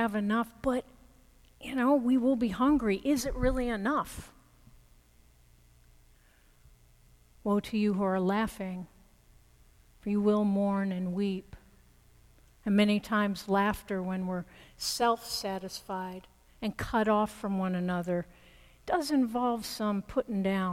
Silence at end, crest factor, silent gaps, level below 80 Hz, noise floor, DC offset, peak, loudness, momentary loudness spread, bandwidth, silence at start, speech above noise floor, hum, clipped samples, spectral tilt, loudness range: 0 s; 16 dB; none; -50 dBFS; -62 dBFS; under 0.1%; -14 dBFS; -30 LUFS; 12 LU; 16 kHz; 0 s; 32 dB; none; under 0.1%; -5.5 dB/octave; 5 LU